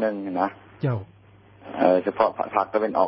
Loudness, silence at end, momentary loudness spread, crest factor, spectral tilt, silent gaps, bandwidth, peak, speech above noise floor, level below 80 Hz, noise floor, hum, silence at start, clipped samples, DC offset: -24 LUFS; 0 s; 9 LU; 20 dB; -11.5 dB/octave; none; 5.6 kHz; -4 dBFS; 28 dB; -60 dBFS; -51 dBFS; none; 0 s; under 0.1%; under 0.1%